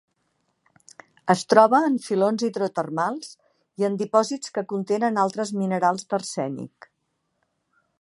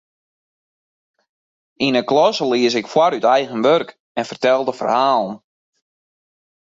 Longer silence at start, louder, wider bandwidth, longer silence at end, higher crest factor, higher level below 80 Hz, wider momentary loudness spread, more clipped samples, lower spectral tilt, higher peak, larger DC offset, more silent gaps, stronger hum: second, 1.25 s vs 1.8 s; second, -23 LUFS vs -17 LUFS; first, 11.5 kHz vs 7.8 kHz; about the same, 1.35 s vs 1.3 s; first, 24 dB vs 16 dB; second, -76 dBFS vs -66 dBFS; about the same, 13 LU vs 11 LU; neither; about the same, -5.5 dB/octave vs -4.5 dB/octave; about the same, 0 dBFS vs -2 dBFS; neither; second, none vs 4.00-4.15 s; neither